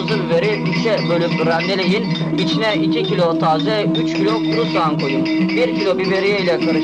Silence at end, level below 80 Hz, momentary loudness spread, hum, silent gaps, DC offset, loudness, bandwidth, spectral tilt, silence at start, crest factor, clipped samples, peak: 0 s; -54 dBFS; 2 LU; none; none; 0.1%; -17 LUFS; 9.8 kHz; -6.5 dB/octave; 0 s; 8 dB; under 0.1%; -8 dBFS